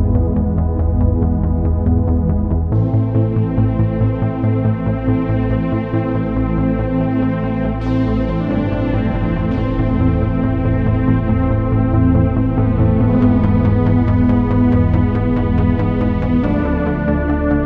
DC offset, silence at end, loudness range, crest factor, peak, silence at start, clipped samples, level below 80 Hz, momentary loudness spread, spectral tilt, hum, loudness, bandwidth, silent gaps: under 0.1%; 0 s; 3 LU; 12 dB; -2 dBFS; 0 s; under 0.1%; -22 dBFS; 4 LU; -11.5 dB/octave; none; -16 LUFS; 4.4 kHz; none